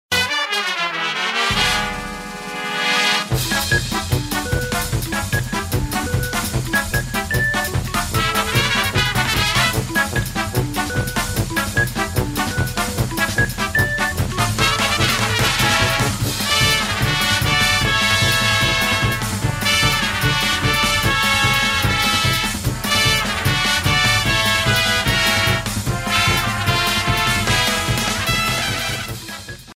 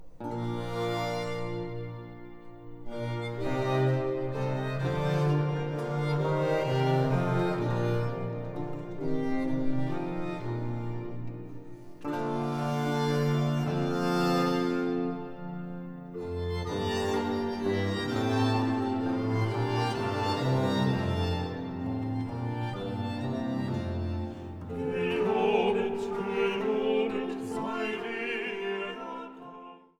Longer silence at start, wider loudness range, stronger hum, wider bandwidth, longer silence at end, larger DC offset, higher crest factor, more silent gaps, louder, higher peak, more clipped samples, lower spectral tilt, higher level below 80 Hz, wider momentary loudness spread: about the same, 0.1 s vs 0 s; about the same, 5 LU vs 5 LU; neither; about the same, 16.5 kHz vs 15.5 kHz; second, 0 s vs 0.2 s; neither; about the same, 16 dB vs 16 dB; neither; first, -17 LUFS vs -30 LUFS; first, -2 dBFS vs -14 dBFS; neither; second, -3 dB/octave vs -7 dB/octave; first, -32 dBFS vs -52 dBFS; second, 7 LU vs 12 LU